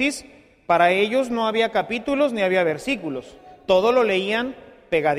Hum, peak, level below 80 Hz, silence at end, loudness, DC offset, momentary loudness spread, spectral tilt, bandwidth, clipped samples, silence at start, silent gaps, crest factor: none; -4 dBFS; -56 dBFS; 0 s; -21 LUFS; under 0.1%; 12 LU; -4.5 dB/octave; 14.5 kHz; under 0.1%; 0 s; none; 18 dB